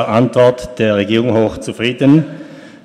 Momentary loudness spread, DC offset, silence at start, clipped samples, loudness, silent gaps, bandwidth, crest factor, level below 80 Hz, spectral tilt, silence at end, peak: 8 LU; under 0.1%; 0 s; under 0.1%; -13 LUFS; none; 12 kHz; 14 dB; -44 dBFS; -7 dB/octave; 0.15 s; 0 dBFS